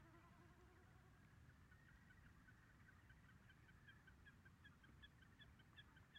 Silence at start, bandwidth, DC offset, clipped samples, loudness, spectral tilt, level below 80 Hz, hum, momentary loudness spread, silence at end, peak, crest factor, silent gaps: 0 s; 9.4 kHz; under 0.1%; under 0.1%; -69 LUFS; -5 dB/octave; -76 dBFS; none; 3 LU; 0 s; -52 dBFS; 16 dB; none